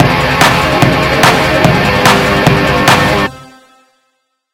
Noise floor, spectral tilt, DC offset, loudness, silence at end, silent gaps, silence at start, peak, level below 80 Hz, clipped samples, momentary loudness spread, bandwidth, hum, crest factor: -63 dBFS; -4.5 dB/octave; under 0.1%; -9 LUFS; 1.1 s; none; 0 s; 0 dBFS; -28 dBFS; 0.6%; 2 LU; 18.5 kHz; none; 10 dB